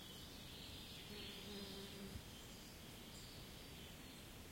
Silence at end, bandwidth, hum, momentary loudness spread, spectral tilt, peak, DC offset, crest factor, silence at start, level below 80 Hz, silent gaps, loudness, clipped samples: 0 s; 16.5 kHz; none; 5 LU; -3.5 dB/octave; -40 dBFS; under 0.1%; 16 dB; 0 s; -64 dBFS; none; -54 LUFS; under 0.1%